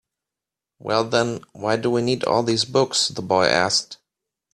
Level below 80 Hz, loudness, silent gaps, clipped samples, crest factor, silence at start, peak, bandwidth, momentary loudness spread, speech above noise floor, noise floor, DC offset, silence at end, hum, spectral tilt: -60 dBFS; -21 LUFS; none; under 0.1%; 20 dB; 0.85 s; -2 dBFS; 13.5 kHz; 8 LU; 67 dB; -87 dBFS; under 0.1%; 0.6 s; none; -3.5 dB/octave